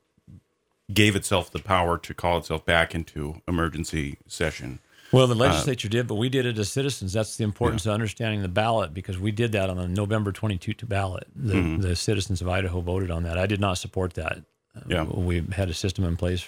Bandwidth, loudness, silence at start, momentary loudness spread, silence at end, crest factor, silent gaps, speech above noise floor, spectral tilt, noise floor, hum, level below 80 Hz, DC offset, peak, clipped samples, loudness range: 16.5 kHz; -26 LUFS; 0.3 s; 9 LU; 0 s; 24 dB; none; 46 dB; -5.5 dB/octave; -71 dBFS; none; -42 dBFS; under 0.1%; -2 dBFS; under 0.1%; 3 LU